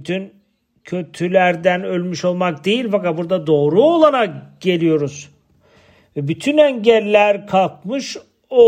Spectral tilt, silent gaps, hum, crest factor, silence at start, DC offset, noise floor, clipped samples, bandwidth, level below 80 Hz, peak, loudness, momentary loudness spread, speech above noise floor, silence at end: -6 dB/octave; none; none; 16 dB; 0 s; under 0.1%; -53 dBFS; under 0.1%; 10.5 kHz; -62 dBFS; 0 dBFS; -17 LUFS; 14 LU; 37 dB; 0 s